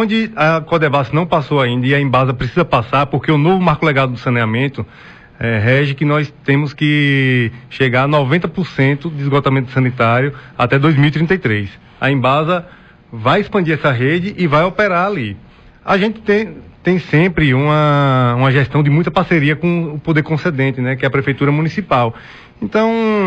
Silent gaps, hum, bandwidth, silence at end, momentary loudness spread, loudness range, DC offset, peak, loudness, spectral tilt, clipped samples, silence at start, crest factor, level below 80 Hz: none; none; 7.8 kHz; 0 s; 7 LU; 2 LU; under 0.1%; -2 dBFS; -14 LUFS; -8 dB/octave; under 0.1%; 0 s; 12 dB; -42 dBFS